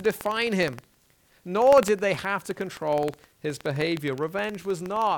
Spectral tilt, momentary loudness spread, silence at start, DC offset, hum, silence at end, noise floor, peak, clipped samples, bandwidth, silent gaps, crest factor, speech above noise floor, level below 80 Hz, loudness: -5 dB/octave; 14 LU; 0 s; under 0.1%; none; 0 s; -62 dBFS; -6 dBFS; under 0.1%; 19 kHz; none; 20 dB; 37 dB; -60 dBFS; -26 LUFS